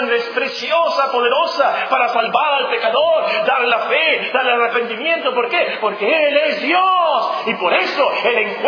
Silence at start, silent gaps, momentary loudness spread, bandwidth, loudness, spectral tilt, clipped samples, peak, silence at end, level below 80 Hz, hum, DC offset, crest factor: 0 s; none; 4 LU; 5.4 kHz; -16 LUFS; -3.5 dB/octave; under 0.1%; -2 dBFS; 0 s; -76 dBFS; none; under 0.1%; 16 dB